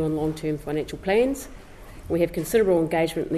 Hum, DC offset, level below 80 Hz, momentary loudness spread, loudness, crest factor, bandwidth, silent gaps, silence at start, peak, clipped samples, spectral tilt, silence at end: none; under 0.1%; -44 dBFS; 10 LU; -24 LUFS; 16 dB; 14 kHz; none; 0 s; -10 dBFS; under 0.1%; -6 dB/octave; 0 s